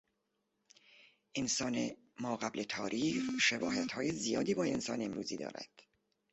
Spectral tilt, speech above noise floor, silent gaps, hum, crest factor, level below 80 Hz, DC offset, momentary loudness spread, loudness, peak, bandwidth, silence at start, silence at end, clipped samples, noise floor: -3 dB/octave; 47 dB; none; none; 20 dB; -72 dBFS; under 0.1%; 12 LU; -36 LUFS; -18 dBFS; 8.2 kHz; 1.35 s; 0.65 s; under 0.1%; -83 dBFS